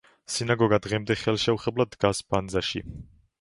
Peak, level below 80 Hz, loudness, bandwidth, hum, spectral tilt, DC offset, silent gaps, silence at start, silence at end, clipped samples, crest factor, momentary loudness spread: -6 dBFS; -50 dBFS; -26 LUFS; 11.5 kHz; none; -5 dB/octave; under 0.1%; none; 0.3 s; 0.4 s; under 0.1%; 20 dB; 10 LU